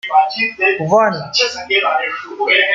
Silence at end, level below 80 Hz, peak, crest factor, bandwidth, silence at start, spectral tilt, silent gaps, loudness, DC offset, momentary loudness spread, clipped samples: 0 s; -60 dBFS; 0 dBFS; 14 dB; 7.6 kHz; 0.05 s; -3 dB/octave; none; -15 LUFS; under 0.1%; 5 LU; under 0.1%